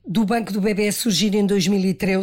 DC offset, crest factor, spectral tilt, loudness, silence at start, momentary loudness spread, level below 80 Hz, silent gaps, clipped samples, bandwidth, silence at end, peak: under 0.1%; 8 dB; -5 dB/octave; -20 LUFS; 0.05 s; 3 LU; -50 dBFS; none; under 0.1%; 17 kHz; 0 s; -10 dBFS